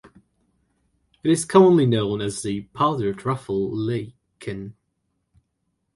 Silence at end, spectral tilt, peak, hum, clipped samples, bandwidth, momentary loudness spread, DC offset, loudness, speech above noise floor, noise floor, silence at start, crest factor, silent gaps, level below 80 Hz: 1.25 s; -6 dB/octave; -2 dBFS; none; under 0.1%; 11.5 kHz; 19 LU; under 0.1%; -21 LUFS; 54 dB; -74 dBFS; 1.25 s; 22 dB; none; -56 dBFS